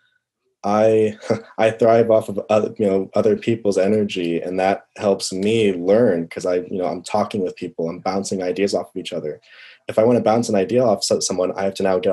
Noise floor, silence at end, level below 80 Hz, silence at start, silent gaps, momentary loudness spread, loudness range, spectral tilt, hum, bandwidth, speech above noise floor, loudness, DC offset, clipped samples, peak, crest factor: -70 dBFS; 0 s; -62 dBFS; 0.65 s; none; 9 LU; 5 LU; -5 dB/octave; none; 12.5 kHz; 51 dB; -19 LUFS; under 0.1%; under 0.1%; -4 dBFS; 16 dB